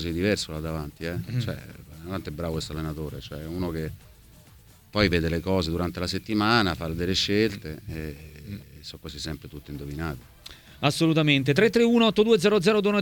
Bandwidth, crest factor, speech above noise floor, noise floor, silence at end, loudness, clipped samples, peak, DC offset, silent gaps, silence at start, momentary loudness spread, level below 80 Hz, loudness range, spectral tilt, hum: 19 kHz; 20 dB; 27 dB; -53 dBFS; 0 s; -25 LUFS; under 0.1%; -6 dBFS; under 0.1%; none; 0 s; 20 LU; -44 dBFS; 11 LU; -5.5 dB/octave; none